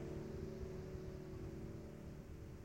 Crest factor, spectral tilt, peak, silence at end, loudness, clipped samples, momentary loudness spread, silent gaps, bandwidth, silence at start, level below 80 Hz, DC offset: 14 dB; -7.5 dB/octave; -34 dBFS; 0 s; -51 LUFS; under 0.1%; 5 LU; none; 16 kHz; 0 s; -56 dBFS; under 0.1%